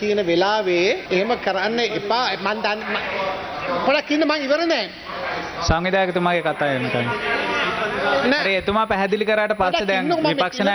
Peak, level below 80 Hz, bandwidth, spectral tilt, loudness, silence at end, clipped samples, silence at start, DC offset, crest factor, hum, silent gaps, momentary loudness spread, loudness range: -2 dBFS; -44 dBFS; over 20 kHz; -5 dB/octave; -20 LUFS; 0 s; under 0.1%; 0 s; under 0.1%; 18 dB; none; none; 6 LU; 2 LU